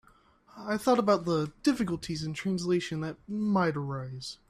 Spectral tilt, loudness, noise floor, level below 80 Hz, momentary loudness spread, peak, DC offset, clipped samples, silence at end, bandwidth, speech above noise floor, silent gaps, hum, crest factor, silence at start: -6 dB/octave; -30 LUFS; -61 dBFS; -60 dBFS; 11 LU; -12 dBFS; under 0.1%; under 0.1%; 0.15 s; 14.5 kHz; 32 dB; none; none; 18 dB; 0.55 s